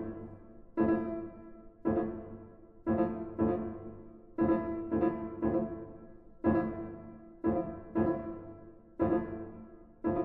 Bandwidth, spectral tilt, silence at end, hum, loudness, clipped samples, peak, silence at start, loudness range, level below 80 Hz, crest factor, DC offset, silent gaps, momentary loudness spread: 3.6 kHz; -12 dB/octave; 0 s; none; -34 LUFS; under 0.1%; -16 dBFS; 0 s; 2 LU; -56 dBFS; 20 dB; under 0.1%; none; 20 LU